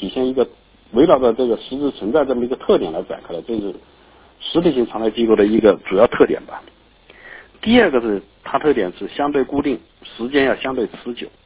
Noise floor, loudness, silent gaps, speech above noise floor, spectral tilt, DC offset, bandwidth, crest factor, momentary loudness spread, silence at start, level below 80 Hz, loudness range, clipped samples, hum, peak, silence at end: -46 dBFS; -18 LUFS; none; 29 dB; -10 dB/octave; under 0.1%; 4 kHz; 18 dB; 15 LU; 0 s; -48 dBFS; 4 LU; under 0.1%; none; 0 dBFS; 0.15 s